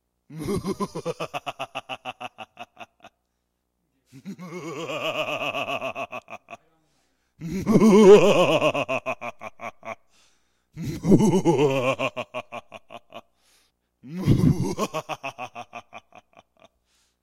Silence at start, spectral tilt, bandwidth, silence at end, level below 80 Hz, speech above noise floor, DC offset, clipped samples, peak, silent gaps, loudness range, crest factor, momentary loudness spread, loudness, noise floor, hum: 0.3 s; -6 dB/octave; 15 kHz; 1.25 s; -50 dBFS; 58 dB; under 0.1%; under 0.1%; -4 dBFS; none; 16 LU; 22 dB; 24 LU; -22 LUFS; -76 dBFS; 60 Hz at -55 dBFS